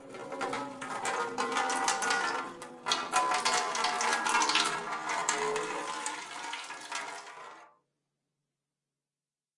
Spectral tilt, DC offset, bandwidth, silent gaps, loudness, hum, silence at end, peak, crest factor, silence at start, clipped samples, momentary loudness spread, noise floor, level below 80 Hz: -0.5 dB/octave; under 0.1%; 11.5 kHz; none; -31 LUFS; none; 1.9 s; -12 dBFS; 22 dB; 0 s; under 0.1%; 13 LU; under -90 dBFS; -76 dBFS